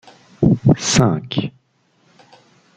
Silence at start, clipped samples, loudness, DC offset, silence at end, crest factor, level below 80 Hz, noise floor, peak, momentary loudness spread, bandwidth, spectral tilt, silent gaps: 0.4 s; under 0.1%; -17 LUFS; under 0.1%; 1.25 s; 18 dB; -44 dBFS; -60 dBFS; -2 dBFS; 10 LU; 9.4 kHz; -5 dB/octave; none